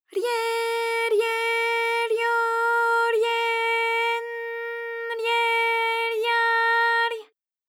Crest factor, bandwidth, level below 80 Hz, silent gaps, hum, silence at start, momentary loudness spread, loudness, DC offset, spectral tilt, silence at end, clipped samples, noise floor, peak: 12 dB; 17 kHz; under -90 dBFS; none; none; 0.15 s; 10 LU; -23 LUFS; under 0.1%; 2 dB/octave; 0.45 s; under 0.1%; -47 dBFS; -12 dBFS